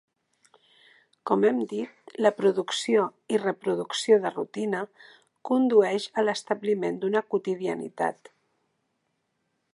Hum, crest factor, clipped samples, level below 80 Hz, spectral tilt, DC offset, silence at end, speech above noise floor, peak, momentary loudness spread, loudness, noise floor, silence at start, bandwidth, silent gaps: none; 20 dB; under 0.1%; -82 dBFS; -4.5 dB/octave; under 0.1%; 1.6 s; 51 dB; -8 dBFS; 10 LU; -26 LUFS; -76 dBFS; 1.25 s; 11.5 kHz; none